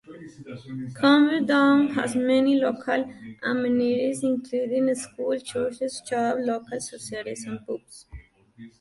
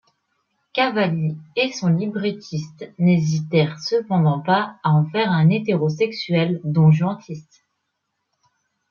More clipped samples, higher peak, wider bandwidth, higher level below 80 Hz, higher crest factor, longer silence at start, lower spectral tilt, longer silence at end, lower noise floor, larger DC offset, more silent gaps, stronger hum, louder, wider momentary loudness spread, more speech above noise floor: neither; about the same, -6 dBFS vs -4 dBFS; first, 11.5 kHz vs 7 kHz; about the same, -58 dBFS vs -62 dBFS; about the same, 18 dB vs 16 dB; second, 0.1 s vs 0.75 s; second, -4.5 dB/octave vs -7 dB/octave; second, 0.15 s vs 1.5 s; second, -48 dBFS vs -76 dBFS; neither; neither; neither; second, -24 LUFS vs -20 LUFS; first, 17 LU vs 11 LU; second, 24 dB vs 56 dB